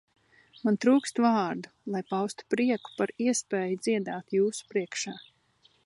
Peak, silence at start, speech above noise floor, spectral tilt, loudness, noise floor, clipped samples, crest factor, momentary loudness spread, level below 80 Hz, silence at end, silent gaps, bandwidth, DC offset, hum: -10 dBFS; 0.65 s; 38 dB; -4.5 dB/octave; -29 LUFS; -66 dBFS; under 0.1%; 18 dB; 11 LU; -80 dBFS; 0.65 s; none; 11.5 kHz; under 0.1%; none